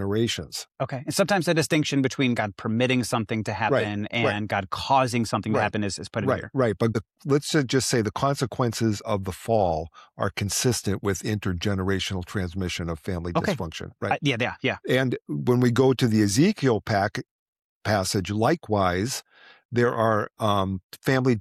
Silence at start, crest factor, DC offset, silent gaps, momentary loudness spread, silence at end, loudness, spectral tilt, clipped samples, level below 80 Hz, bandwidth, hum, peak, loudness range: 0 s; 16 dB; under 0.1%; 17.31-17.53 s, 17.64-17.81 s, 19.65-19.69 s, 20.83-20.89 s; 8 LU; 0 s; -25 LUFS; -5 dB/octave; under 0.1%; -52 dBFS; 15 kHz; none; -8 dBFS; 4 LU